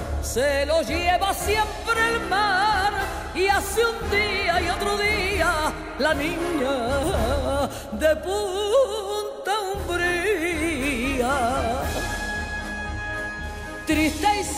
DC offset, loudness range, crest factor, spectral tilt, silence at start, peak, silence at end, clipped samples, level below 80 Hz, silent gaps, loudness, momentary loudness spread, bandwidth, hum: under 0.1%; 3 LU; 14 dB; -4 dB/octave; 0 s; -10 dBFS; 0 s; under 0.1%; -36 dBFS; none; -23 LUFS; 7 LU; 16 kHz; none